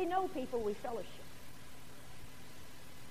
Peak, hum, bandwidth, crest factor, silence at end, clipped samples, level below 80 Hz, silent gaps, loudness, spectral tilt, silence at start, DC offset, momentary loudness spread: -22 dBFS; none; 15.5 kHz; 20 dB; 0 s; under 0.1%; -64 dBFS; none; -40 LUFS; -5 dB/octave; 0 s; 0.6%; 17 LU